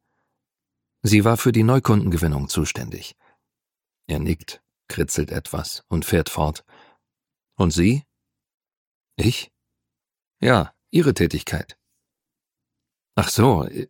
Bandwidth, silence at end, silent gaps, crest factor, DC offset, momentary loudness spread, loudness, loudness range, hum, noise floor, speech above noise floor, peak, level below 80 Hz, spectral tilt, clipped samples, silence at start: 17.5 kHz; 0.05 s; 8.54-8.58 s, 8.77-9.01 s, 10.27-10.31 s; 22 dB; under 0.1%; 16 LU; -21 LUFS; 6 LU; none; -89 dBFS; 69 dB; 0 dBFS; -40 dBFS; -5.5 dB/octave; under 0.1%; 1.05 s